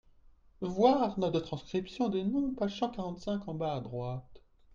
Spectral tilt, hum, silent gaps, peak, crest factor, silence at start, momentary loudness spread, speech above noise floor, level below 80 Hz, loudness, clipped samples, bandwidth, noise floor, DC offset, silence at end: -7.5 dB/octave; none; none; -12 dBFS; 22 dB; 0.6 s; 12 LU; 28 dB; -58 dBFS; -33 LUFS; under 0.1%; 7.4 kHz; -60 dBFS; under 0.1%; 0 s